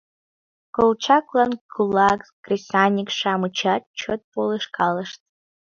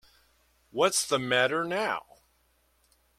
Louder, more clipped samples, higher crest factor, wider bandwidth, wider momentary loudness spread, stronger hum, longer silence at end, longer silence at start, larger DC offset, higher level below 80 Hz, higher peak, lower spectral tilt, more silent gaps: first, -21 LUFS vs -27 LUFS; neither; about the same, 20 dB vs 22 dB; second, 7.6 kHz vs 15.5 kHz; about the same, 10 LU vs 10 LU; neither; second, 0.6 s vs 1.2 s; about the same, 0.75 s vs 0.75 s; neither; first, -60 dBFS vs -68 dBFS; first, -2 dBFS vs -10 dBFS; first, -5 dB/octave vs -2.5 dB/octave; first, 1.61-1.69 s, 2.33-2.43 s, 3.87-3.94 s, 4.24-4.32 s vs none